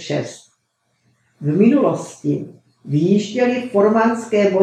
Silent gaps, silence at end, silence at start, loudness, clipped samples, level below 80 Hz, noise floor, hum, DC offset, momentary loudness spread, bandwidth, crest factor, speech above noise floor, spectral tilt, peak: none; 0 s; 0 s; -18 LUFS; under 0.1%; -72 dBFS; -68 dBFS; none; under 0.1%; 11 LU; 10 kHz; 16 dB; 51 dB; -7 dB/octave; 0 dBFS